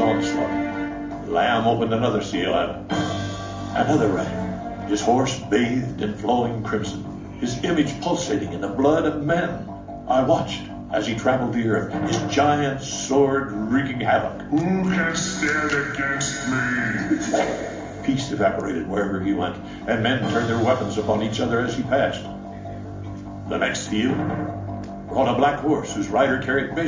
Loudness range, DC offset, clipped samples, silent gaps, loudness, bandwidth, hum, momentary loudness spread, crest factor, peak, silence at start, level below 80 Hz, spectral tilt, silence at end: 3 LU; under 0.1%; under 0.1%; none; -23 LUFS; 7.6 kHz; none; 10 LU; 18 dB; -6 dBFS; 0 s; -46 dBFS; -5 dB/octave; 0 s